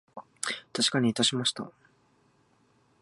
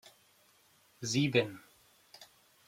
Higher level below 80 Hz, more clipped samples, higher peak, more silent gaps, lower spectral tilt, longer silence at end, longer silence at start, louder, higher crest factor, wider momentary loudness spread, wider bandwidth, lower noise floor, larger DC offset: about the same, -72 dBFS vs -76 dBFS; neither; first, -8 dBFS vs -14 dBFS; neither; second, -3 dB/octave vs -4.5 dB/octave; first, 1.3 s vs 0.45 s; second, 0.15 s vs 1 s; first, -27 LUFS vs -32 LUFS; about the same, 24 dB vs 24 dB; second, 17 LU vs 26 LU; second, 11.5 kHz vs 16.5 kHz; about the same, -66 dBFS vs -67 dBFS; neither